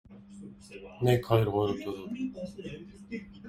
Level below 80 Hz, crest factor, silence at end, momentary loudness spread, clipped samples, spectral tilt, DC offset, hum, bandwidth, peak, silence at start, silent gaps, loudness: -58 dBFS; 22 dB; 0 s; 22 LU; under 0.1%; -7.5 dB/octave; under 0.1%; none; 16 kHz; -10 dBFS; 0.1 s; none; -30 LUFS